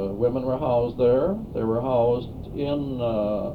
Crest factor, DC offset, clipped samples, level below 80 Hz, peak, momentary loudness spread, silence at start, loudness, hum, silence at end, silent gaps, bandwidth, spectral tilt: 14 dB; under 0.1%; under 0.1%; -44 dBFS; -10 dBFS; 7 LU; 0 s; -24 LUFS; none; 0 s; none; 4.8 kHz; -10 dB/octave